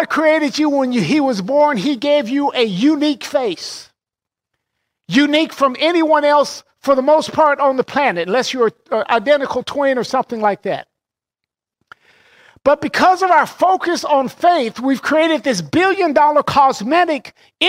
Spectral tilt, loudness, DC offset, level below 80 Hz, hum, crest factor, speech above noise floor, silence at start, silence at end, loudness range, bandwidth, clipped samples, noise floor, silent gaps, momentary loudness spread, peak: -4.5 dB/octave; -15 LUFS; under 0.1%; -58 dBFS; none; 14 dB; 71 dB; 0 s; 0 s; 4 LU; 16 kHz; under 0.1%; -86 dBFS; none; 6 LU; -2 dBFS